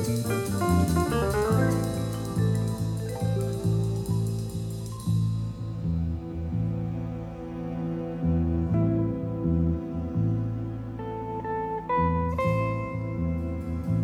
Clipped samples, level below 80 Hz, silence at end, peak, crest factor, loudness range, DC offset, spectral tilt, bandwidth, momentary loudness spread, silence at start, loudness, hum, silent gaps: under 0.1%; -40 dBFS; 0 s; -12 dBFS; 16 dB; 4 LU; under 0.1%; -7.5 dB/octave; 16.5 kHz; 9 LU; 0 s; -28 LUFS; none; none